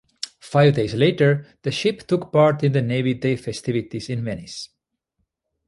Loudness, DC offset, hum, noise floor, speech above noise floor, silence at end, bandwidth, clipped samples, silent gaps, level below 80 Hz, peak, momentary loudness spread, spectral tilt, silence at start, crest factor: -21 LUFS; under 0.1%; none; -75 dBFS; 55 dB; 1 s; 11.5 kHz; under 0.1%; none; -54 dBFS; -4 dBFS; 15 LU; -6.5 dB/octave; 0.25 s; 18 dB